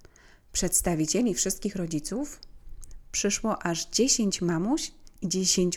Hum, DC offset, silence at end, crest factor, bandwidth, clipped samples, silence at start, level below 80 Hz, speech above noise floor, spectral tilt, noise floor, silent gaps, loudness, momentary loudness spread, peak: none; under 0.1%; 0 s; 20 dB; 18 kHz; under 0.1%; 0.55 s; -46 dBFS; 27 dB; -3.5 dB/octave; -54 dBFS; none; -27 LUFS; 11 LU; -10 dBFS